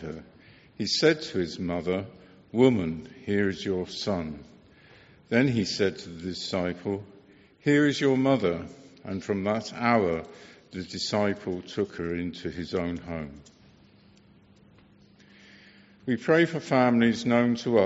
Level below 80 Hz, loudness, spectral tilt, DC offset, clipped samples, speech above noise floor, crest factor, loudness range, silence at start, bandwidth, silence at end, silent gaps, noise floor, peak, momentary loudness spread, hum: -58 dBFS; -27 LUFS; -4.5 dB/octave; under 0.1%; under 0.1%; 31 dB; 22 dB; 9 LU; 0 s; 8 kHz; 0 s; none; -57 dBFS; -6 dBFS; 15 LU; none